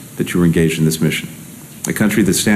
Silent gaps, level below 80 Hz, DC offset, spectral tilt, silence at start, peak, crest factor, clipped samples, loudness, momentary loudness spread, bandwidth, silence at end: none; -42 dBFS; under 0.1%; -5 dB/octave; 0 s; -2 dBFS; 14 dB; under 0.1%; -16 LUFS; 17 LU; 15 kHz; 0 s